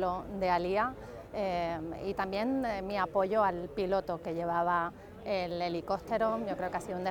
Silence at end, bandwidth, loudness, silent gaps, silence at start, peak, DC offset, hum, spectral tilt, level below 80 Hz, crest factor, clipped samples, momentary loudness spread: 0 s; 19 kHz; -33 LUFS; none; 0 s; -16 dBFS; under 0.1%; none; -6.5 dB/octave; -56 dBFS; 18 dB; under 0.1%; 7 LU